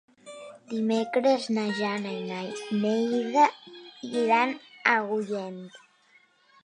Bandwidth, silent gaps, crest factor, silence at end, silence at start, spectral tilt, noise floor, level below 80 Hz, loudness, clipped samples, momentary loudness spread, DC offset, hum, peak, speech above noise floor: 10.5 kHz; none; 20 dB; 0.9 s; 0.25 s; -5 dB/octave; -62 dBFS; -82 dBFS; -27 LUFS; under 0.1%; 21 LU; under 0.1%; none; -6 dBFS; 36 dB